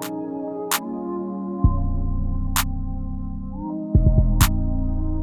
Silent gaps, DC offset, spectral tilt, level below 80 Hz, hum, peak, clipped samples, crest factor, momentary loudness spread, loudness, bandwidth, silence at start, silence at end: none; under 0.1%; -5.5 dB/octave; -24 dBFS; none; -2 dBFS; under 0.1%; 20 dB; 12 LU; -24 LUFS; 19.5 kHz; 0 s; 0 s